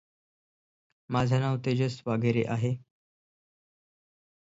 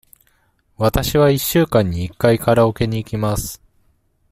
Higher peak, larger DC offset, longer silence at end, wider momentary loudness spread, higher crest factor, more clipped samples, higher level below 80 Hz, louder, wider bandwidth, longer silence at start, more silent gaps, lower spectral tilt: second, -14 dBFS vs -2 dBFS; neither; first, 1.65 s vs 0.75 s; about the same, 6 LU vs 8 LU; about the same, 18 dB vs 18 dB; neither; second, -62 dBFS vs -36 dBFS; second, -29 LUFS vs -17 LUFS; second, 7.8 kHz vs 16 kHz; first, 1.1 s vs 0.8 s; neither; first, -7.5 dB/octave vs -6 dB/octave